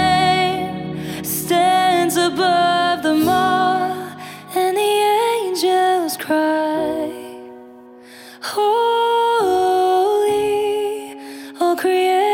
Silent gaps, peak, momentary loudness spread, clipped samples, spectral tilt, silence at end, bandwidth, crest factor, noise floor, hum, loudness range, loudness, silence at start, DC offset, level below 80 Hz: none; -4 dBFS; 12 LU; under 0.1%; -4 dB/octave; 0 s; 17.5 kHz; 12 dB; -41 dBFS; none; 4 LU; -17 LUFS; 0 s; under 0.1%; -54 dBFS